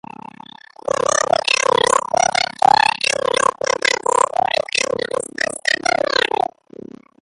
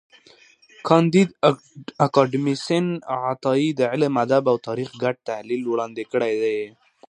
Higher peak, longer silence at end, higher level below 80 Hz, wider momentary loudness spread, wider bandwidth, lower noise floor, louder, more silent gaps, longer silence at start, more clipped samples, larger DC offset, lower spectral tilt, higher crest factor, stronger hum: about the same, 0 dBFS vs 0 dBFS; first, 1.05 s vs 0.4 s; first, -56 dBFS vs -70 dBFS; about the same, 11 LU vs 11 LU; about the same, 11.5 kHz vs 10.5 kHz; second, -41 dBFS vs -53 dBFS; first, -17 LUFS vs -22 LUFS; neither; first, 1.1 s vs 0.85 s; neither; neither; second, -1 dB/octave vs -6.5 dB/octave; about the same, 18 dB vs 20 dB; neither